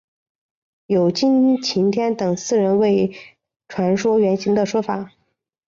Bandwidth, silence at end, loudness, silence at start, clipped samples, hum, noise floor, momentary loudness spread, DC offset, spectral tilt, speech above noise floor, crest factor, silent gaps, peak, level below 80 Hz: 7.6 kHz; 0.6 s; -19 LUFS; 0.9 s; under 0.1%; none; -70 dBFS; 8 LU; under 0.1%; -6 dB/octave; 52 dB; 12 dB; none; -8 dBFS; -60 dBFS